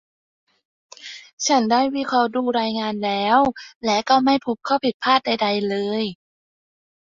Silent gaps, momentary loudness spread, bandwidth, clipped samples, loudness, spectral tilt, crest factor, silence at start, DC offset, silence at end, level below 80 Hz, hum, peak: 1.33-1.37 s, 3.76-3.81 s, 4.94-5.00 s; 10 LU; 7.6 kHz; under 0.1%; -20 LUFS; -3.5 dB/octave; 20 dB; 1 s; under 0.1%; 1.05 s; -60 dBFS; none; -2 dBFS